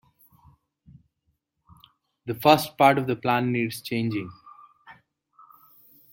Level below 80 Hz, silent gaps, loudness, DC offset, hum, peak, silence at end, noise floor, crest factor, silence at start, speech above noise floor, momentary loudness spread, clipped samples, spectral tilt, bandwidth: -66 dBFS; none; -23 LUFS; under 0.1%; none; -2 dBFS; 1.2 s; -75 dBFS; 26 dB; 2.25 s; 53 dB; 15 LU; under 0.1%; -5.5 dB/octave; 17 kHz